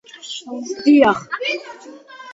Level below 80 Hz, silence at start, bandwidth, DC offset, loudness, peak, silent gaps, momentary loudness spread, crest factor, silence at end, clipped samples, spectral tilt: -60 dBFS; 0.25 s; 7.8 kHz; under 0.1%; -17 LUFS; 0 dBFS; none; 24 LU; 18 dB; 0 s; under 0.1%; -4 dB/octave